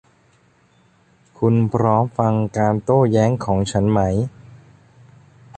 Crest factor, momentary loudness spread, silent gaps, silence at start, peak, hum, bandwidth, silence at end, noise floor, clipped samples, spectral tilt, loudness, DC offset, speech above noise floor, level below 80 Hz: 18 dB; 5 LU; none; 1.4 s; -2 dBFS; none; 9 kHz; 1 s; -57 dBFS; under 0.1%; -8 dB/octave; -18 LUFS; under 0.1%; 39 dB; -44 dBFS